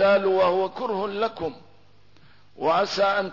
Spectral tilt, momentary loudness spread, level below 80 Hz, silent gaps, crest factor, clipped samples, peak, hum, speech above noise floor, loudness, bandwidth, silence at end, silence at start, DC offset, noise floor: -5 dB/octave; 9 LU; -62 dBFS; none; 14 dB; under 0.1%; -10 dBFS; 50 Hz at -60 dBFS; 35 dB; -24 LUFS; 6 kHz; 0 s; 0 s; 0.3%; -57 dBFS